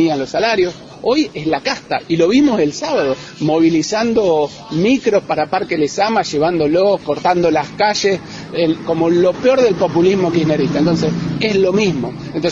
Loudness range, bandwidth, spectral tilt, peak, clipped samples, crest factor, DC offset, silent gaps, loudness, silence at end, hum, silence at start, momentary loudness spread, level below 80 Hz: 1 LU; 7.8 kHz; -5.5 dB/octave; -2 dBFS; under 0.1%; 14 dB; under 0.1%; none; -15 LUFS; 0 s; none; 0 s; 6 LU; -46 dBFS